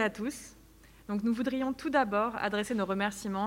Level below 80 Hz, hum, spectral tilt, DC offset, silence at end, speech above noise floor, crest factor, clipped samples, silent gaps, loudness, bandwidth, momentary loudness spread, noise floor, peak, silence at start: -60 dBFS; none; -5 dB/octave; under 0.1%; 0 s; 25 dB; 18 dB; under 0.1%; none; -31 LUFS; 16 kHz; 11 LU; -57 dBFS; -14 dBFS; 0 s